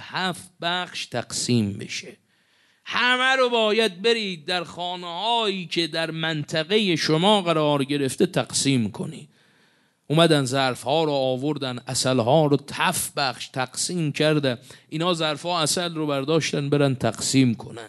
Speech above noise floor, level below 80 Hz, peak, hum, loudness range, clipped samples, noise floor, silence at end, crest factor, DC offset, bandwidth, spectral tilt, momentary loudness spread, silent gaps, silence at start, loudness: 40 dB; -64 dBFS; -2 dBFS; none; 2 LU; under 0.1%; -62 dBFS; 0 s; 22 dB; under 0.1%; 12 kHz; -4 dB/octave; 10 LU; none; 0 s; -23 LUFS